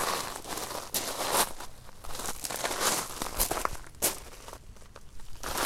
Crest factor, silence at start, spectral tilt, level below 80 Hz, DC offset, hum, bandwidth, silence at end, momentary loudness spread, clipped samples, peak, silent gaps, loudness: 26 dB; 0 s; -1 dB/octave; -46 dBFS; under 0.1%; none; 16.5 kHz; 0 s; 21 LU; under 0.1%; -8 dBFS; none; -31 LUFS